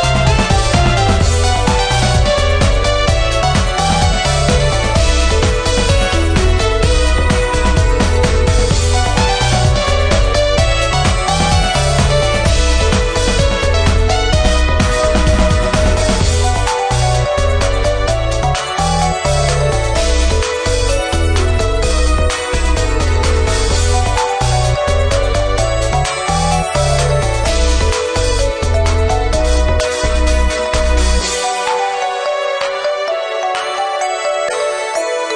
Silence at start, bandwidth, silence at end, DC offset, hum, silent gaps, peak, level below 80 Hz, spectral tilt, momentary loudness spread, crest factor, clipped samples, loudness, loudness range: 0 s; 10.5 kHz; 0 s; under 0.1%; none; none; 0 dBFS; -16 dBFS; -4.5 dB/octave; 3 LU; 12 dB; under 0.1%; -14 LUFS; 2 LU